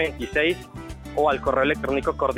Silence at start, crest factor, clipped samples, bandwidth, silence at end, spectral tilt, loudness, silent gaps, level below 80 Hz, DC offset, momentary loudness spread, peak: 0 s; 16 dB; under 0.1%; 16 kHz; 0 s; -5.5 dB/octave; -23 LUFS; none; -40 dBFS; under 0.1%; 11 LU; -8 dBFS